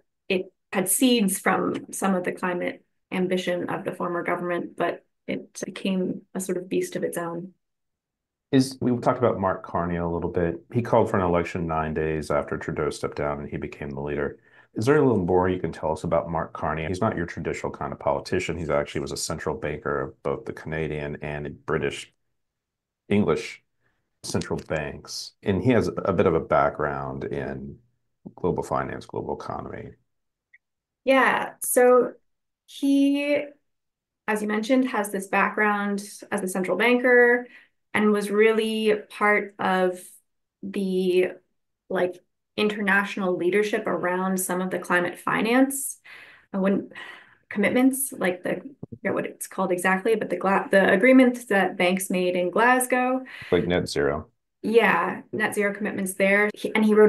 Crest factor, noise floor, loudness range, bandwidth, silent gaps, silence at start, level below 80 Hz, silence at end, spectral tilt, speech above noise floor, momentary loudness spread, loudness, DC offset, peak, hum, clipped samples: 20 dB; -85 dBFS; 8 LU; 13 kHz; none; 0.3 s; -52 dBFS; 0 s; -5 dB/octave; 62 dB; 13 LU; -24 LUFS; under 0.1%; -6 dBFS; none; under 0.1%